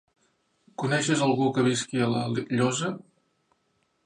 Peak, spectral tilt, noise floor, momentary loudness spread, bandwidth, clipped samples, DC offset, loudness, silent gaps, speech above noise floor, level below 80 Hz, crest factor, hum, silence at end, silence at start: -10 dBFS; -5 dB/octave; -72 dBFS; 10 LU; 11 kHz; under 0.1%; under 0.1%; -26 LUFS; none; 47 dB; -68 dBFS; 16 dB; none; 1.05 s; 0.8 s